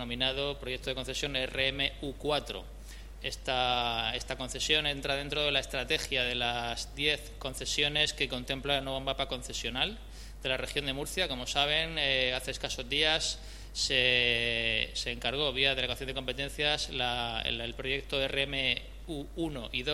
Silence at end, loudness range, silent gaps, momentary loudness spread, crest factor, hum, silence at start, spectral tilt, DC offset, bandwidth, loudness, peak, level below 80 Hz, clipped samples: 0 s; 4 LU; none; 10 LU; 22 dB; none; 0 s; -2.5 dB/octave; under 0.1%; 16 kHz; -30 LUFS; -10 dBFS; -46 dBFS; under 0.1%